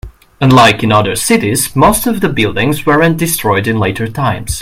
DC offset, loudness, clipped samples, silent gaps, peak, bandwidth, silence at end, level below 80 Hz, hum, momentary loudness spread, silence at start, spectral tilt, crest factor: under 0.1%; -11 LUFS; 0.3%; none; 0 dBFS; 17 kHz; 0 s; -34 dBFS; none; 8 LU; 0.05 s; -4.5 dB/octave; 12 dB